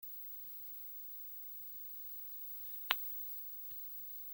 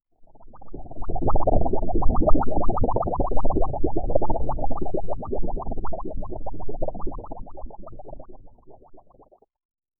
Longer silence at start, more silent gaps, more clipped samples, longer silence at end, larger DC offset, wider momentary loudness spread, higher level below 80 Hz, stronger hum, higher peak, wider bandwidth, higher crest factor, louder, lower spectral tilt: about the same, 0 s vs 0 s; second, none vs 9.65-9.69 s; neither; about the same, 0 s vs 0 s; neither; second, 8 LU vs 19 LU; second, -86 dBFS vs -28 dBFS; neither; second, -12 dBFS vs -2 dBFS; first, 17 kHz vs 1.5 kHz; first, 34 dB vs 16 dB; second, -42 LUFS vs -28 LUFS; second, -0.5 dB/octave vs -14 dB/octave